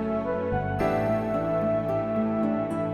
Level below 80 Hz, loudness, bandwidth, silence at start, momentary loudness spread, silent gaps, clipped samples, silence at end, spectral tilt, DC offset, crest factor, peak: -46 dBFS; -26 LUFS; 14 kHz; 0 s; 2 LU; none; under 0.1%; 0 s; -9 dB/octave; under 0.1%; 12 dB; -14 dBFS